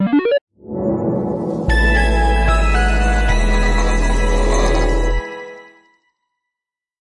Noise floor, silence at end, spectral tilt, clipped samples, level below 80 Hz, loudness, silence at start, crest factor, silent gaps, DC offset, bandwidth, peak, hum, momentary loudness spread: -85 dBFS; 1.45 s; -5.5 dB/octave; under 0.1%; -18 dBFS; -17 LUFS; 0 s; 12 dB; 0.41-0.47 s; under 0.1%; 11 kHz; -4 dBFS; none; 8 LU